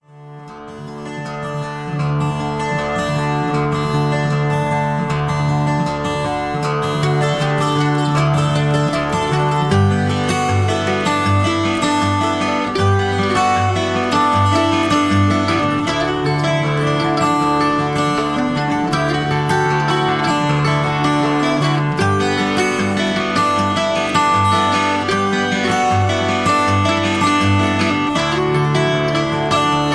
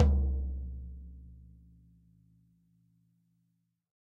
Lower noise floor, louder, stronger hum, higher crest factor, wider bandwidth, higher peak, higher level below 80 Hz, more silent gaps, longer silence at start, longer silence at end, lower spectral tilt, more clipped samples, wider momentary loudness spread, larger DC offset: second, -36 dBFS vs -78 dBFS; first, -16 LUFS vs -35 LUFS; neither; second, 14 dB vs 22 dB; first, 11 kHz vs 2.3 kHz; first, -2 dBFS vs -12 dBFS; second, -42 dBFS vs -36 dBFS; neither; first, 0.15 s vs 0 s; second, 0 s vs 2.65 s; second, -5.5 dB/octave vs -10 dB/octave; neither; second, 5 LU vs 25 LU; neither